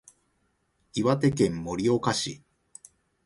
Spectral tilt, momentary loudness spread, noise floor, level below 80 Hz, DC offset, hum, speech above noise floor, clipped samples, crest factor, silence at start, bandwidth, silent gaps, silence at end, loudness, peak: -5.5 dB/octave; 11 LU; -72 dBFS; -56 dBFS; under 0.1%; none; 47 dB; under 0.1%; 20 dB; 0.95 s; 11.5 kHz; none; 0.9 s; -26 LUFS; -10 dBFS